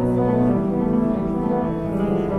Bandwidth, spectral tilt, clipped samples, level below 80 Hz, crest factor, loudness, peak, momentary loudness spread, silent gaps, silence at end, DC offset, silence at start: 4.5 kHz; -10.5 dB/octave; under 0.1%; -38 dBFS; 12 dB; -21 LUFS; -8 dBFS; 4 LU; none; 0 s; under 0.1%; 0 s